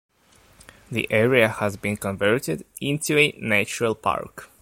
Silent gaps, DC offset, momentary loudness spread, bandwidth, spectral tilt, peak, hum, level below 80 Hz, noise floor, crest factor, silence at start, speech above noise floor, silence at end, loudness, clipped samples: none; under 0.1%; 10 LU; 16.5 kHz; -4.5 dB/octave; -2 dBFS; none; -56 dBFS; -56 dBFS; 22 dB; 0.9 s; 34 dB; 0.15 s; -22 LUFS; under 0.1%